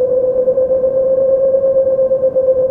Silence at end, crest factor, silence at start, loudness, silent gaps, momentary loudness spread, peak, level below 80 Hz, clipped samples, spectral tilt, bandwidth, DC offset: 0 s; 8 dB; 0 s; -13 LUFS; none; 1 LU; -4 dBFS; -46 dBFS; under 0.1%; -11 dB/octave; 1.7 kHz; under 0.1%